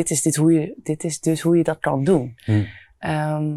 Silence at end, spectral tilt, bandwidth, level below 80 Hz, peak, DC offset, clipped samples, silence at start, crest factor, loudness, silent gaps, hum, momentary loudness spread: 0 s; -6 dB/octave; 13.5 kHz; -56 dBFS; -6 dBFS; under 0.1%; under 0.1%; 0 s; 14 dB; -21 LUFS; none; none; 9 LU